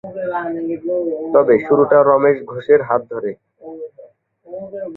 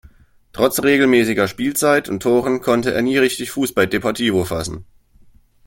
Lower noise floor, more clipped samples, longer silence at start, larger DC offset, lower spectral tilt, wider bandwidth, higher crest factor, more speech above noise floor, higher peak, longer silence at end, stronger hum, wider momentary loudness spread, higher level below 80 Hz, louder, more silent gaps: second, -45 dBFS vs -49 dBFS; neither; second, 0.05 s vs 0.55 s; neither; first, -10 dB/octave vs -4.5 dB/octave; second, 4.1 kHz vs 17 kHz; about the same, 16 dB vs 18 dB; about the same, 29 dB vs 32 dB; about the same, -2 dBFS vs -2 dBFS; second, 0 s vs 0.85 s; neither; first, 22 LU vs 8 LU; second, -60 dBFS vs -48 dBFS; about the same, -16 LUFS vs -17 LUFS; neither